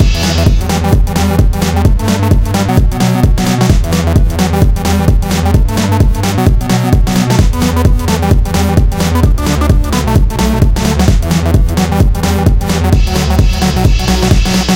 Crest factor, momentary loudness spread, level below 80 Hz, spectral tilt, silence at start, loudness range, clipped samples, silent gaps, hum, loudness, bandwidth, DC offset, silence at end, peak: 10 dB; 1 LU; -12 dBFS; -6 dB/octave; 0 s; 0 LU; 0.7%; none; none; -11 LUFS; 17 kHz; under 0.1%; 0 s; 0 dBFS